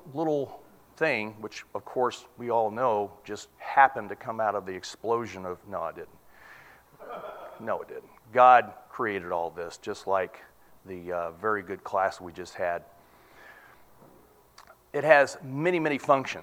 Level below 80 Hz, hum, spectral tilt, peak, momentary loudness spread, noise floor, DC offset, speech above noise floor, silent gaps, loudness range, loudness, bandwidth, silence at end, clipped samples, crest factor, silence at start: -68 dBFS; none; -5 dB/octave; -2 dBFS; 20 LU; -57 dBFS; under 0.1%; 30 dB; none; 9 LU; -27 LUFS; 16 kHz; 0 s; under 0.1%; 26 dB; 0.05 s